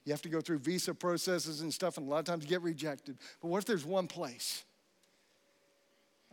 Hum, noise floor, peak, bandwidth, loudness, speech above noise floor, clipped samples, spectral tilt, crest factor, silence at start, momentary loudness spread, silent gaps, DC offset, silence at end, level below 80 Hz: none; -72 dBFS; -22 dBFS; 17.5 kHz; -36 LUFS; 36 dB; under 0.1%; -4 dB/octave; 16 dB; 0.05 s; 7 LU; none; under 0.1%; 1.7 s; under -90 dBFS